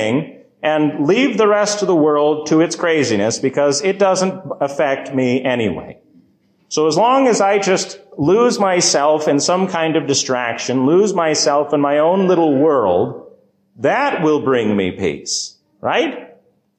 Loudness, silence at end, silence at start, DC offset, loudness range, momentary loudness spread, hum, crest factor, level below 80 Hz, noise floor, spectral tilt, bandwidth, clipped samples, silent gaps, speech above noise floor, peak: -16 LUFS; 0.5 s; 0 s; under 0.1%; 4 LU; 8 LU; none; 12 dB; -54 dBFS; -56 dBFS; -4 dB/octave; 9.8 kHz; under 0.1%; none; 41 dB; -4 dBFS